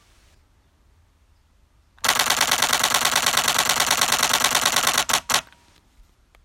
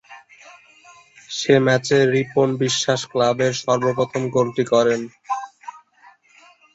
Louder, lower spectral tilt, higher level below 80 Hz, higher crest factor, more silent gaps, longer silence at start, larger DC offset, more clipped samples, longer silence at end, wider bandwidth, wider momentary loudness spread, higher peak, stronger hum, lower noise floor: about the same, -18 LUFS vs -19 LUFS; second, 0.5 dB/octave vs -4.5 dB/octave; first, -54 dBFS vs -62 dBFS; first, 24 dB vs 18 dB; neither; first, 2.05 s vs 0.1 s; neither; neither; about the same, 1 s vs 1 s; first, 17 kHz vs 8 kHz; second, 3 LU vs 12 LU; about the same, 0 dBFS vs -2 dBFS; neither; first, -59 dBFS vs -52 dBFS